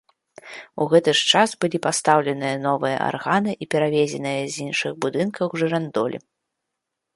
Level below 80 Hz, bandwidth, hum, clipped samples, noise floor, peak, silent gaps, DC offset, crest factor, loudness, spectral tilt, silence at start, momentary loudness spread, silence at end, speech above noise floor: -68 dBFS; 11.5 kHz; none; under 0.1%; -81 dBFS; -2 dBFS; none; under 0.1%; 20 dB; -21 LUFS; -4 dB/octave; 0.45 s; 10 LU; 1 s; 60 dB